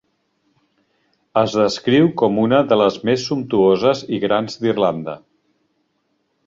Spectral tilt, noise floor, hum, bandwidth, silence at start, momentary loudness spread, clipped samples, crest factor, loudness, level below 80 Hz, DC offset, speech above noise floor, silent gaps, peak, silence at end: -6 dB/octave; -68 dBFS; none; 7.8 kHz; 1.35 s; 7 LU; under 0.1%; 16 dB; -17 LUFS; -58 dBFS; under 0.1%; 51 dB; none; -2 dBFS; 1.3 s